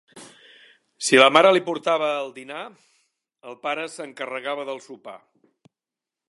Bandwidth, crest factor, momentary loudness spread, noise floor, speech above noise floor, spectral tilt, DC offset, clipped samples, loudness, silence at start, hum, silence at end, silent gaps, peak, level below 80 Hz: 11.5 kHz; 24 dB; 26 LU; -89 dBFS; 67 dB; -2.5 dB/octave; under 0.1%; under 0.1%; -20 LUFS; 0.15 s; none; 1.1 s; none; 0 dBFS; -76 dBFS